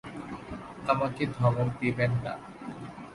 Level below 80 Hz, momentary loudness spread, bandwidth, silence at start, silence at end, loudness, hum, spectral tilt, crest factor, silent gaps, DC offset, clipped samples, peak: -56 dBFS; 15 LU; 11.5 kHz; 0.05 s; 0 s; -30 LUFS; none; -8 dB/octave; 20 dB; none; under 0.1%; under 0.1%; -10 dBFS